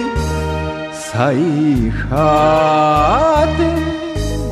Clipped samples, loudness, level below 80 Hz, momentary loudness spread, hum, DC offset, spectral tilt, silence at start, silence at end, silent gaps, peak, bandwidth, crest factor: under 0.1%; -15 LUFS; -26 dBFS; 9 LU; none; under 0.1%; -6.5 dB/octave; 0 s; 0 s; none; -2 dBFS; 14.5 kHz; 12 dB